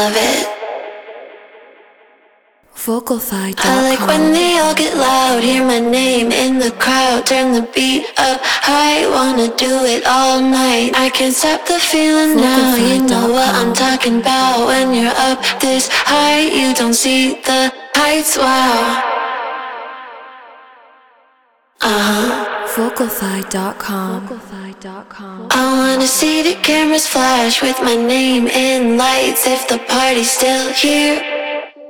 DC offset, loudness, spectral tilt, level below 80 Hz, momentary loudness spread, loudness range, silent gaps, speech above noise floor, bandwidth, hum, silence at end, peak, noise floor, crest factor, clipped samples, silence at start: under 0.1%; -13 LUFS; -2.5 dB/octave; -48 dBFS; 10 LU; 7 LU; none; 42 dB; over 20 kHz; none; 0 s; 0 dBFS; -55 dBFS; 14 dB; under 0.1%; 0 s